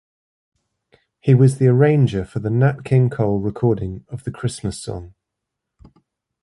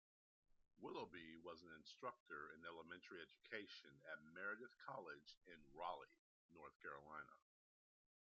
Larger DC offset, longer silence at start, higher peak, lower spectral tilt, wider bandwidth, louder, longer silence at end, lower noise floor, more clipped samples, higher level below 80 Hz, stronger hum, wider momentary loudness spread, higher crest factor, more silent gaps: neither; first, 1.25 s vs 0.5 s; first, -2 dBFS vs -36 dBFS; first, -8 dB/octave vs -1.5 dB/octave; first, 11.5 kHz vs 7.2 kHz; first, -18 LUFS vs -57 LUFS; first, 1.35 s vs 0.85 s; second, -81 dBFS vs under -90 dBFS; neither; first, -46 dBFS vs -88 dBFS; neither; first, 15 LU vs 10 LU; second, 16 dB vs 22 dB; second, none vs 2.20-2.26 s, 5.37-5.41 s, 6.19-6.49 s, 6.75-6.80 s